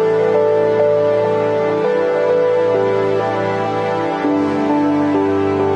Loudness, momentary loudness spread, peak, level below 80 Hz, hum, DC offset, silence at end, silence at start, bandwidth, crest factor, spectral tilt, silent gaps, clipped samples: -16 LUFS; 4 LU; -4 dBFS; -58 dBFS; none; under 0.1%; 0 s; 0 s; 8.8 kHz; 12 dB; -7.5 dB/octave; none; under 0.1%